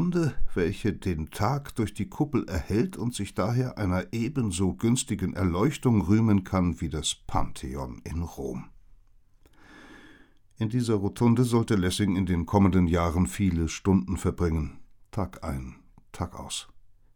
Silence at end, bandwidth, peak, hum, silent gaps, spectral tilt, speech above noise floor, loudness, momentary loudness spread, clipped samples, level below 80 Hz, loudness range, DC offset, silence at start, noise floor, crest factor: 0.3 s; 18 kHz; -8 dBFS; none; none; -6 dB/octave; 31 dB; -27 LUFS; 13 LU; under 0.1%; -40 dBFS; 9 LU; under 0.1%; 0 s; -57 dBFS; 20 dB